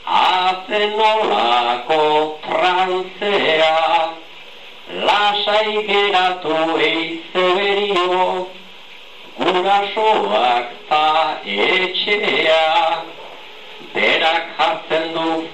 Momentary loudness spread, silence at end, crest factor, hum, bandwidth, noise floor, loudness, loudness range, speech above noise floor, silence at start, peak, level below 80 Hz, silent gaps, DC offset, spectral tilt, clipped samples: 16 LU; 0 s; 14 dB; none; 9.4 kHz; -40 dBFS; -16 LUFS; 2 LU; 23 dB; 0 s; -2 dBFS; -62 dBFS; none; 0.9%; -3.5 dB/octave; under 0.1%